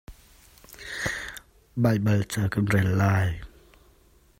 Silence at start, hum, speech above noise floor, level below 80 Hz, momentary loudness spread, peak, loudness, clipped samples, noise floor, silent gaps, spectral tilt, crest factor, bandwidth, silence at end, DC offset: 0.1 s; none; 36 dB; -50 dBFS; 17 LU; -10 dBFS; -25 LUFS; under 0.1%; -58 dBFS; none; -6.5 dB/octave; 18 dB; 16 kHz; 0.95 s; under 0.1%